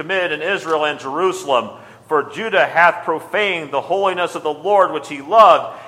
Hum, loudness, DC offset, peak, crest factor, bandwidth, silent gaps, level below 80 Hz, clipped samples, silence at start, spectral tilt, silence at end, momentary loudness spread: none; -17 LUFS; under 0.1%; 0 dBFS; 16 dB; 15 kHz; none; -66 dBFS; under 0.1%; 0 s; -3.5 dB/octave; 0 s; 10 LU